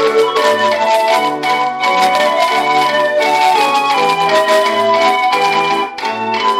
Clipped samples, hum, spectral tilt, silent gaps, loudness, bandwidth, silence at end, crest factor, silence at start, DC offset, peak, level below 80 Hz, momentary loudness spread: under 0.1%; none; -2.5 dB/octave; none; -12 LUFS; 16.5 kHz; 0 s; 12 dB; 0 s; under 0.1%; -2 dBFS; -60 dBFS; 4 LU